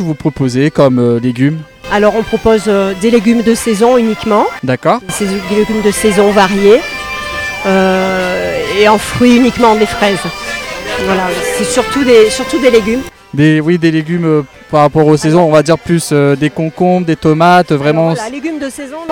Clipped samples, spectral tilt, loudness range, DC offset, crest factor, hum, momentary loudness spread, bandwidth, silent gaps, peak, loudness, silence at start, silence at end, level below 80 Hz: 1%; -5.5 dB/octave; 1 LU; under 0.1%; 10 dB; none; 9 LU; 19.5 kHz; none; 0 dBFS; -11 LUFS; 0 s; 0 s; -38 dBFS